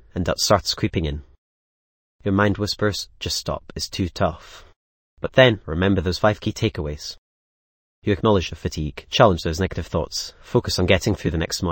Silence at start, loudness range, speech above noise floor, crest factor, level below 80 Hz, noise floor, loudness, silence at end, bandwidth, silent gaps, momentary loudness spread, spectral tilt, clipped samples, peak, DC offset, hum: 0.15 s; 3 LU; over 69 dB; 22 dB; -38 dBFS; under -90 dBFS; -22 LUFS; 0 s; 17 kHz; 1.38-2.19 s, 4.76-5.17 s, 7.18-8.02 s; 13 LU; -5 dB/octave; under 0.1%; 0 dBFS; under 0.1%; none